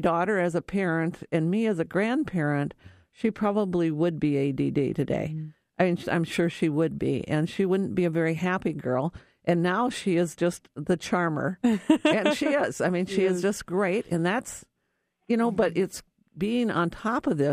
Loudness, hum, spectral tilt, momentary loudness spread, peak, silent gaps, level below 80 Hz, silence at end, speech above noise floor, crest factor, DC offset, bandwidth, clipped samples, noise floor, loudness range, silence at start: -26 LUFS; none; -6.5 dB/octave; 6 LU; -8 dBFS; none; -58 dBFS; 0 s; 52 dB; 18 dB; under 0.1%; 15 kHz; under 0.1%; -77 dBFS; 3 LU; 0 s